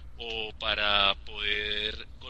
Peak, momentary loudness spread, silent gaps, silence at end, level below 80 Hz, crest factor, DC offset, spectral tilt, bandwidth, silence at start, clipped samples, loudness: -10 dBFS; 11 LU; none; 0 s; -46 dBFS; 22 dB; 0.5%; -3.5 dB/octave; 8.6 kHz; 0 s; under 0.1%; -28 LUFS